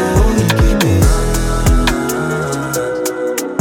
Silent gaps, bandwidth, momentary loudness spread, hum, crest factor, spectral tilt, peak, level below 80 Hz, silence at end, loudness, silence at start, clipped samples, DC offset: none; 17 kHz; 6 LU; none; 12 dB; -5 dB/octave; 0 dBFS; -18 dBFS; 0 s; -15 LUFS; 0 s; under 0.1%; under 0.1%